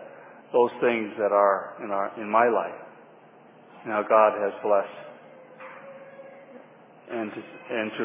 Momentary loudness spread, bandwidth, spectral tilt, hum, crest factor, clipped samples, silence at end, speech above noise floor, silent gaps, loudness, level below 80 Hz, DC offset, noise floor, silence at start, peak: 24 LU; 3.8 kHz; -8.5 dB/octave; none; 22 dB; under 0.1%; 0 s; 28 dB; none; -25 LUFS; -84 dBFS; under 0.1%; -52 dBFS; 0 s; -6 dBFS